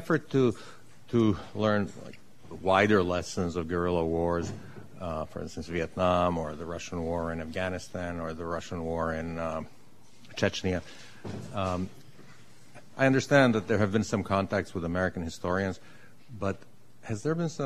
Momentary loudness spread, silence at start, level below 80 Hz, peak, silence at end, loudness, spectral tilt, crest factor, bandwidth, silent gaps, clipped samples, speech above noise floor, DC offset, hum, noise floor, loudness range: 17 LU; 0 s; -52 dBFS; -6 dBFS; 0 s; -29 LUFS; -6 dB/octave; 24 dB; 13.5 kHz; none; under 0.1%; 28 dB; 0.5%; none; -57 dBFS; 7 LU